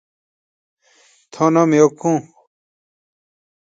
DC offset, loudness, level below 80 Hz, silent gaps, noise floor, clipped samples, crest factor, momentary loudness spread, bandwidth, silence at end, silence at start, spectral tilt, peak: under 0.1%; -16 LUFS; -68 dBFS; none; -55 dBFS; under 0.1%; 20 dB; 7 LU; 7.8 kHz; 1.4 s; 1.35 s; -6.5 dB/octave; 0 dBFS